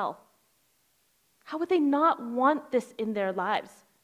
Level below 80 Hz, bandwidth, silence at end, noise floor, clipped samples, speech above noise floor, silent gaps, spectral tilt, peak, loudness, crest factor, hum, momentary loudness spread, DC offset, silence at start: -80 dBFS; 15.5 kHz; 0.35 s; -70 dBFS; under 0.1%; 42 dB; none; -6 dB/octave; -10 dBFS; -27 LUFS; 18 dB; none; 11 LU; under 0.1%; 0 s